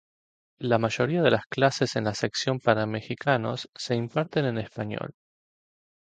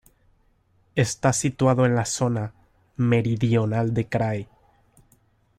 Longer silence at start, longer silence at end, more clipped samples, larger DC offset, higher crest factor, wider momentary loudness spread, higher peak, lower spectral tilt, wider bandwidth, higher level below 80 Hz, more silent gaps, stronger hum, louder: second, 0.6 s vs 0.95 s; second, 0.9 s vs 1.15 s; neither; neither; about the same, 22 dB vs 18 dB; about the same, 10 LU vs 10 LU; about the same, -6 dBFS vs -6 dBFS; about the same, -5.5 dB/octave vs -6 dB/octave; second, 9.2 kHz vs 13.5 kHz; second, -62 dBFS vs -54 dBFS; first, 1.46-1.50 s, 3.69-3.73 s vs none; neither; second, -27 LUFS vs -23 LUFS